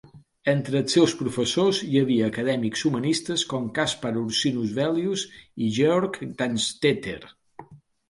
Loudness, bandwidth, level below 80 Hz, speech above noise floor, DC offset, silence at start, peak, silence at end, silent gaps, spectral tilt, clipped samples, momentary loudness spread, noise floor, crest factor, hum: -24 LUFS; 11.5 kHz; -60 dBFS; 23 dB; under 0.1%; 0.05 s; -6 dBFS; 0.35 s; none; -4.5 dB/octave; under 0.1%; 8 LU; -47 dBFS; 18 dB; none